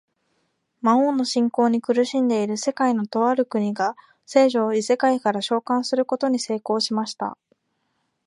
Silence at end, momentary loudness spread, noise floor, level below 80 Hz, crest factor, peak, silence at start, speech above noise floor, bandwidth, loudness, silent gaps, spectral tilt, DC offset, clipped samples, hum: 0.9 s; 6 LU; -72 dBFS; -76 dBFS; 18 dB; -4 dBFS; 0.85 s; 51 dB; 11 kHz; -22 LUFS; none; -4.5 dB/octave; under 0.1%; under 0.1%; none